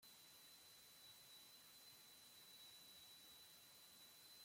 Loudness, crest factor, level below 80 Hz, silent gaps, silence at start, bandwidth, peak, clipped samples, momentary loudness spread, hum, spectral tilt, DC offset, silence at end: -62 LUFS; 12 dB; under -90 dBFS; none; 0 s; 16.5 kHz; -52 dBFS; under 0.1%; 2 LU; none; 0 dB/octave; under 0.1%; 0 s